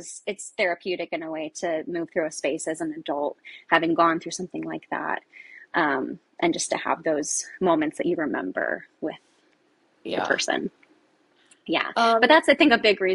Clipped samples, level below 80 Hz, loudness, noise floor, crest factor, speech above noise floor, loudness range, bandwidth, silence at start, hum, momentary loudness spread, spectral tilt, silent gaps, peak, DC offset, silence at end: under 0.1%; -68 dBFS; -24 LUFS; -64 dBFS; 22 dB; 40 dB; 6 LU; 11.5 kHz; 0 s; none; 16 LU; -3 dB/octave; none; -4 dBFS; under 0.1%; 0 s